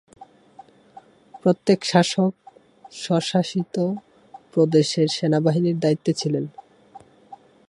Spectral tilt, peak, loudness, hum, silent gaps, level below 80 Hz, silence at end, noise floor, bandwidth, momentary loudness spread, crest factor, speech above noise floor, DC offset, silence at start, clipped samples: -6 dB/octave; -2 dBFS; -21 LUFS; none; none; -68 dBFS; 0.35 s; -49 dBFS; 11.5 kHz; 9 LU; 20 dB; 29 dB; under 0.1%; 0.2 s; under 0.1%